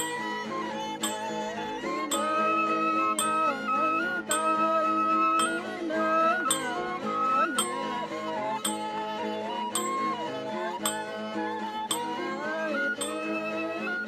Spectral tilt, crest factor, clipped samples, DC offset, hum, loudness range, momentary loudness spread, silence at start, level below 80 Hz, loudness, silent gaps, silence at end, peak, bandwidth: -2.5 dB/octave; 20 dB; under 0.1%; under 0.1%; none; 6 LU; 8 LU; 0 s; -70 dBFS; -28 LUFS; none; 0 s; -8 dBFS; 14 kHz